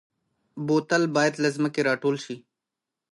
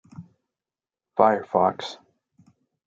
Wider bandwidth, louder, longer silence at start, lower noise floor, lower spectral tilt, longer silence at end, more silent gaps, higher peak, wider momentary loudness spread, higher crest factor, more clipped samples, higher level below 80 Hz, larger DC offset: first, 11.5 kHz vs 7.8 kHz; about the same, -24 LUFS vs -22 LUFS; first, 0.55 s vs 0.2 s; about the same, -87 dBFS vs under -90 dBFS; about the same, -5 dB/octave vs -6 dB/octave; second, 0.75 s vs 0.9 s; neither; second, -10 dBFS vs -2 dBFS; about the same, 16 LU vs 16 LU; second, 16 dB vs 24 dB; neither; about the same, -76 dBFS vs -76 dBFS; neither